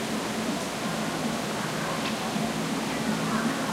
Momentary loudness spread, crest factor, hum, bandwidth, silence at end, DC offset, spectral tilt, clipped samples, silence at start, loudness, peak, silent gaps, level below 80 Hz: 3 LU; 14 dB; none; 16 kHz; 0 s; under 0.1%; -4 dB/octave; under 0.1%; 0 s; -29 LUFS; -14 dBFS; none; -56 dBFS